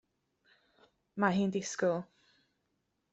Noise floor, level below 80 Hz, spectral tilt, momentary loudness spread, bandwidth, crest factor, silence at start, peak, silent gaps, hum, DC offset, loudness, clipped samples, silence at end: -81 dBFS; -76 dBFS; -5.5 dB/octave; 16 LU; 8.2 kHz; 24 dB; 1.15 s; -14 dBFS; none; none; under 0.1%; -33 LUFS; under 0.1%; 1.1 s